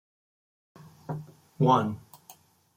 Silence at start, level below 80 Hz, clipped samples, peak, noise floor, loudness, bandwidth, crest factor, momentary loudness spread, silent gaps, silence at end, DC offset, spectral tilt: 1.1 s; -70 dBFS; under 0.1%; -10 dBFS; -56 dBFS; -27 LUFS; 16.5 kHz; 22 dB; 19 LU; none; 0.45 s; under 0.1%; -7.5 dB/octave